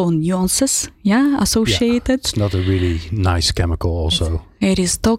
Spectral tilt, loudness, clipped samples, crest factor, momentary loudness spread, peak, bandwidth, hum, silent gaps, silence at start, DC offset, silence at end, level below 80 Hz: -4.5 dB/octave; -17 LUFS; under 0.1%; 10 dB; 5 LU; -6 dBFS; 16 kHz; none; none; 0 s; under 0.1%; 0 s; -30 dBFS